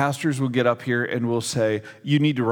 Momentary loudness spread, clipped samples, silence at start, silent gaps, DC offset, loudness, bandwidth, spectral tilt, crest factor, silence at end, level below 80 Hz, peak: 3 LU; under 0.1%; 0 s; none; under 0.1%; -23 LUFS; 18 kHz; -5.5 dB/octave; 18 dB; 0 s; -68 dBFS; -4 dBFS